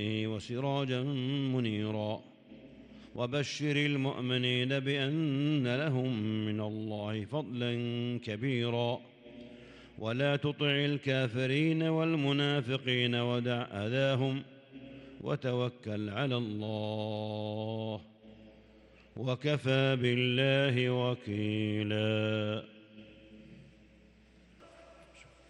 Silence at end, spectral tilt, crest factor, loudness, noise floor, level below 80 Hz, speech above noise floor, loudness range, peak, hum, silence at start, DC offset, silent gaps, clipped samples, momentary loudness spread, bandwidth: 0.25 s; -6.5 dB/octave; 18 dB; -32 LUFS; -61 dBFS; -70 dBFS; 29 dB; 6 LU; -16 dBFS; none; 0 s; under 0.1%; none; under 0.1%; 12 LU; 9.6 kHz